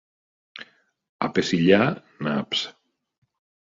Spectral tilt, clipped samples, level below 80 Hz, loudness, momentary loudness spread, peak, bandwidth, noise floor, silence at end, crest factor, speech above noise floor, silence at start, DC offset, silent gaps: -5.5 dB/octave; under 0.1%; -60 dBFS; -23 LUFS; 24 LU; -4 dBFS; 7.8 kHz; -48 dBFS; 0.9 s; 22 dB; 26 dB; 0.55 s; under 0.1%; 1.09-1.19 s